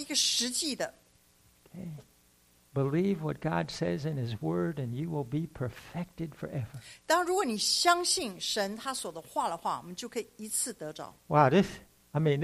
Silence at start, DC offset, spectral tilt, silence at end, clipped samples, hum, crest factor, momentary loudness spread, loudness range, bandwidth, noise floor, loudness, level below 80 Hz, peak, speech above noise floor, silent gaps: 0 s; under 0.1%; -4 dB/octave; 0 s; under 0.1%; 60 Hz at -60 dBFS; 22 dB; 15 LU; 5 LU; 15.5 kHz; -65 dBFS; -31 LUFS; -62 dBFS; -8 dBFS; 34 dB; none